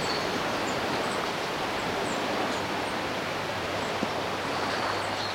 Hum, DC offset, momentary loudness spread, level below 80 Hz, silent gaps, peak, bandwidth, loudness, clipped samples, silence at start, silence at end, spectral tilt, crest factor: none; under 0.1%; 2 LU; -58 dBFS; none; -14 dBFS; 16.5 kHz; -29 LUFS; under 0.1%; 0 s; 0 s; -3.5 dB/octave; 16 dB